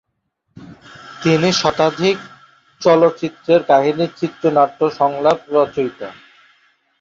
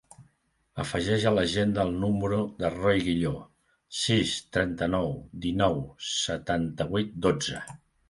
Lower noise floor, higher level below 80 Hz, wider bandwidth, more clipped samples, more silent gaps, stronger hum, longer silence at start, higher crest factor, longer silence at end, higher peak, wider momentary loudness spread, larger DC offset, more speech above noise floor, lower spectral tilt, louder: about the same, -70 dBFS vs -70 dBFS; second, -58 dBFS vs -48 dBFS; second, 7.6 kHz vs 11.5 kHz; neither; neither; neither; first, 0.55 s vs 0.2 s; about the same, 16 dB vs 20 dB; first, 0.9 s vs 0.35 s; first, -2 dBFS vs -8 dBFS; about the same, 11 LU vs 9 LU; neither; first, 55 dB vs 43 dB; about the same, -5.5 dB/octave vs -5 dB/octave; first, -16 LUFS vs -28 LUFS